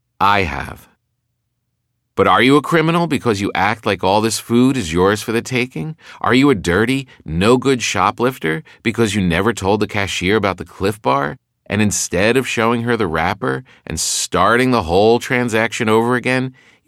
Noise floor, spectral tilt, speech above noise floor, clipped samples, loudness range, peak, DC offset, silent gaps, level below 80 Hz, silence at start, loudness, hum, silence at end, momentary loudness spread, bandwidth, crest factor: -71 dBFS; -4.5 dB/octave; 55 dB; under 0.1%; 2 LU; -2 dBFS; under 0.1%; none; -42 dBFS; 0.2 s; -16 LUFS; none; 0.35 s; 9 LU; 16 kHz; 16 dB